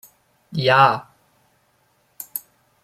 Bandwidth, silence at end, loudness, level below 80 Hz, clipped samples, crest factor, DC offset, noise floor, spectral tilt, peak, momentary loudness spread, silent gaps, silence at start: 16 kHz; 0.45 s; -19 LUFS; -66 dBFS; under 0.1%; 22 dB; under 0.1%; -63 dBFS; -4.5 dB/octave; -2 dBFS; 18 LU; none; 0.5 s